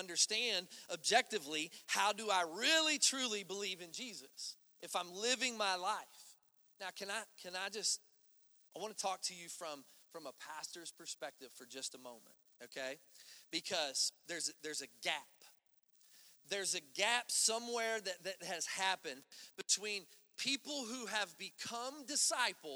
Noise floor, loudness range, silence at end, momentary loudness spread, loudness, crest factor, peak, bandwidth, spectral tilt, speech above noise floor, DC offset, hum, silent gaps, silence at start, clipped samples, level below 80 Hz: -72 dBFS; 11 LU; 0 s; 17 LU; -38 LUFS; 26 dB; -16 dBFS; over 20 kHz; 0 dB/octave; 32 dB; under 0.1%; none; none; 0 s; under 0.1%; under -90 dBFS